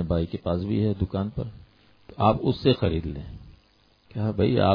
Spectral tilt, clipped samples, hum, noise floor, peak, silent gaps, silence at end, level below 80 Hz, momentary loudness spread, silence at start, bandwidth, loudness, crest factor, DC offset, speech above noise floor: -10 dB/octave; under 0.1%; none; -61 dBFS; -6 dBFS; none; 0 s; -42 dBFS; 16 LU; 0 s; 5.2 kHz; -26 LUFS; 20 dB; under 0.1%; 37 dB